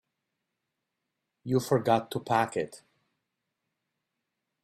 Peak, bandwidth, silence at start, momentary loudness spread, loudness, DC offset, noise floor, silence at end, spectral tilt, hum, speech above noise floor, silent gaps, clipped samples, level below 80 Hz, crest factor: -10 dBFS; 15.5 kHz; 1.45 s; 12 LU; -28 LUFS; under 0.1%; -84 dBFS; 1.85 s; -6 dB/octave; none; 57 dB; none; under 0.1%; -72 dBFS; 22 dB